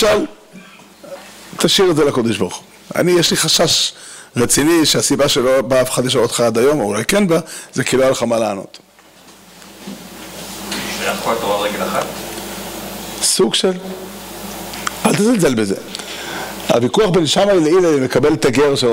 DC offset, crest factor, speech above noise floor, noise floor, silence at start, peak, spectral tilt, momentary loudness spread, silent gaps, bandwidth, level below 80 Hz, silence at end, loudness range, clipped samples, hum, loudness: under 0.1%; 16 dB; 30 dB; -44 dBFS; 0 s; 0 dBFS; -3.5 dB/octave; 17 LU; none; 16.5 kHz; -44 dBFS; 0 s; 8 LU; under 0.1%; none; -15 LUFS